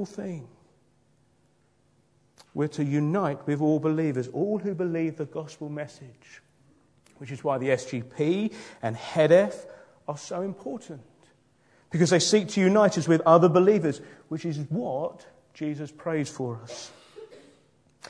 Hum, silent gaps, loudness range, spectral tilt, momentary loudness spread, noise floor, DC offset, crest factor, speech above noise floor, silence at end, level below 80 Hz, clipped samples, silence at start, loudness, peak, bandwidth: none; none; 11 LU; -6 dB/octave; 19 LU; -66 dBFS; under 0.1%; 22 dB; 40 dB; 0.75 s; -72 dBFS; under 0.1%; 0 s; -26 LUFS; -4 dBFS; 10.5 kHz